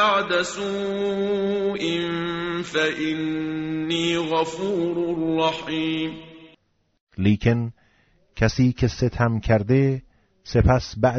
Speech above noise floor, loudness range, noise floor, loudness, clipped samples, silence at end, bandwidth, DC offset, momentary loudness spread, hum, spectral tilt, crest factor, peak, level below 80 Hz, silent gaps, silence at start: 39 dB; 3 LU; -61 dBFS; -23 LUFS; under 0.1%; 0 s; 8 kHz; under 0.1%; 7 LU; none; -5 dB/octave; 18 dB; -4 dBFS; -40 dBFS; 7.01-7.07 s; 0 s